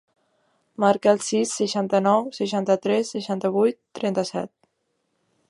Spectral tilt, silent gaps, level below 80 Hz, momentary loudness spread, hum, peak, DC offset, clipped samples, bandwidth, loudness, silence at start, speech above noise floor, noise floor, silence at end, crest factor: -5 dB/octave; none; -72 dBFS; 9 LU; none; -4 dBFS; under 0.1%; under 0.1%; 11.5 kHz; -23 LUFS; 0.8 s; 51 dB; -73 dBFS; 1.05 s; 20 dB